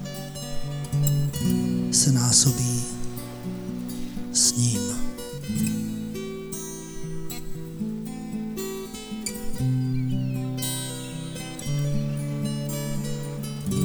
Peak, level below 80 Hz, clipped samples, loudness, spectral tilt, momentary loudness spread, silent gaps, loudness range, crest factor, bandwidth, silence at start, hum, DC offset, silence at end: -4 dBFS; -42 dBFS; under 0.1%; -26 LUFS; -4 dB/octave; 15 LU; none; 9 LU; 22 dB; over 20 kHz; 0 s; none; under 0.1%; 0 s